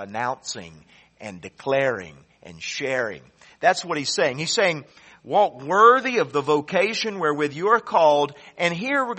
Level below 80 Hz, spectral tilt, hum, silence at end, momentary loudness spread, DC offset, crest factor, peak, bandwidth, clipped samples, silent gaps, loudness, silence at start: -66 dBFS; -3.5 dB/octave; none; 0 s; 16 LU; under 0.1%; 20 dB; -2 dBFS; 8.4 kHz; under 0.1%; none; -21 LUFS; 0 s